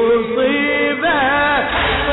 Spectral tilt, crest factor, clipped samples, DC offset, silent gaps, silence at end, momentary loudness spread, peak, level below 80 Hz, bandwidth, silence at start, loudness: -8 dB/octave; 8 dB; under 0.1%; under 0.1%; none; 0 s; 2 LU; -6 dBFS; -34 dBFS; 4.1 kHz; 0 s; -15 LUFS